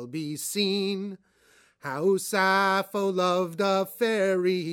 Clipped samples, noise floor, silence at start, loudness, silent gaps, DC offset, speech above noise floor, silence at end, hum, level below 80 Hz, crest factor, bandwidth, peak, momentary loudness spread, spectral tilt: under 0.1%; -61 dBFS; 0 s; -26 LUFS; none; under 0.1%; 35 dB; 0 s; none; -78 dBFS; 16 dB; 18.5 kHz; -10 dBFS; 11 LU; -4 dB/octave